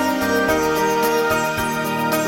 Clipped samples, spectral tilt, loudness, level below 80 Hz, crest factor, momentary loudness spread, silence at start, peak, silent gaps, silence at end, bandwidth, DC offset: under 0.1%; -4 dB/octave; -19 LUFS; -44 dBFS; 14 dB; 3 LU; 0 s; -6 dBFS; none; 0 s; 17 kHz; under 0.1%